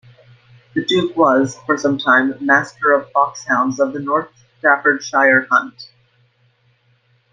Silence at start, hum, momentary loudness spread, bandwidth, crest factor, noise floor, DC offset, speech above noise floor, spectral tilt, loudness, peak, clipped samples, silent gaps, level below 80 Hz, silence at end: 0.75 s; none; 7 LU; 9.4 kHz; 16 dB; -59 dBFS; under 0.1%; 43 dB; -4.5 dB/octave; -16 LUFS; -2 dBFS; under 0.1%; none; -64 dBFS; 1.45 s